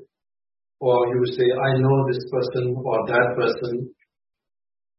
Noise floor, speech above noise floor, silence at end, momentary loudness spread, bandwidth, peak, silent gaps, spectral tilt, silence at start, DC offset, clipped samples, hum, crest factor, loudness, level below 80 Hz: under -90 dBFS; over 69 dB; 1.1 s; 8 LU; 5.8 kHz; -6 dBFS; none; -11 dB/octave; 0 s; under 0.1%; under 0.1%; none; 18 dB; -22 LUFS; -62 dBFS